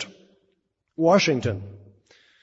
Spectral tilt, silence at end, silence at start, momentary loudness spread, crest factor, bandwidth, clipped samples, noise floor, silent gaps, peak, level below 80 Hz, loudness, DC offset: -5 dB/octave; 0.65 s; 0 s; 23 LU; 20 dB; 8 kHz; under 0.1%; -72 dBFS; none; -6 dBFS; -62 dBFS; -21 LUFS; under 0.1%